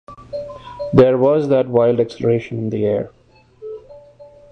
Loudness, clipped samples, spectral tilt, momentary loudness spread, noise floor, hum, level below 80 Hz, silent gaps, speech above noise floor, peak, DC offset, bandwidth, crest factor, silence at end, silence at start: -16 LUFS; under 0.1%; -9 dB/octave; 21 LU; -43 dBFS; none; -50 dBFS; none; 28 dB; -2 dBFS; under 0.1%; 7.8 kHz; 16 dB; 0.25 s; 0.1 s